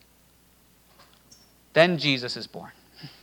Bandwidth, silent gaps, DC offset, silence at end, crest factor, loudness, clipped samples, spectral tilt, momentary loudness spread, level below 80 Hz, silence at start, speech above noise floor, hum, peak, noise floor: 19 kHz; none; under 0.1%; 0.15 s; 28 dB; -23 LUFS; under 0.1%; -5 dB/octave; 26 LU; -68 dBFS; 1.75 s; 35 dB; none; -2 dBFS; -59 dBFS